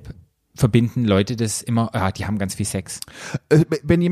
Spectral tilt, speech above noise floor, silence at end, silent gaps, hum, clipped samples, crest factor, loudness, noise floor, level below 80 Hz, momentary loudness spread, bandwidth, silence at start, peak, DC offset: -6 dB/octave; 23 dB; 0 s; none; none; under 0.1%; 18 dB; -20 LUFS; -42 dBFS; -44 dBFS; 11 LU; 15.5 kHz; 0 s; -2 dBFS; under 0.1%